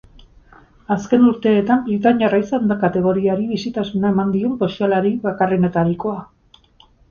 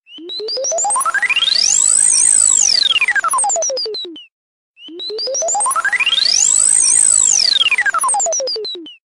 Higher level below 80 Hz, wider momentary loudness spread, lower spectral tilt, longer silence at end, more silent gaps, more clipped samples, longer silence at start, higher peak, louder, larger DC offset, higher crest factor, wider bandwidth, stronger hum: first, -50 dBFS vs -58 dBFS; second, 8 LU vs 14 LU; first, -8 dB/octave vs 3 dB/octave; first, 0.85 s vs 0.15 s; second, none vs 4.32-4.74 s; neither; first, 0.9 s vs 0.1 s; about the same, -2 dBFS vs -2 dBFS; second, -18 LUFS vs -11 LUFS; neither; about the same, 16 dB vs 12 dB; second, 7 kHz vs 16 kHz; neither